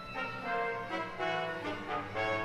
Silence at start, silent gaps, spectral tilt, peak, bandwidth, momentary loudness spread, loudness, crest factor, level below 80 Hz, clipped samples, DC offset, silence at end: 0 s; none; -5 dB/octave; -22 dBFS; 15 kHz; 4 LU; -36 LUFS; 16 dB; -62 dBFS; under 0.1%; under 0.1%; 0 s